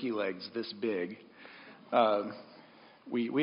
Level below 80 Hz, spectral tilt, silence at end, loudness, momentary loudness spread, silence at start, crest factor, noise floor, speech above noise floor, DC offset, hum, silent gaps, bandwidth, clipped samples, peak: -84 dBFS; -3.5 dB/octave; 0 s; -33 LUFS; 24 LU; 0 s; 22 dB; -57 dBFS; 25 dB; under 0.1%; none; none; 5.4 kHz; under 0.1%; -12 dBFS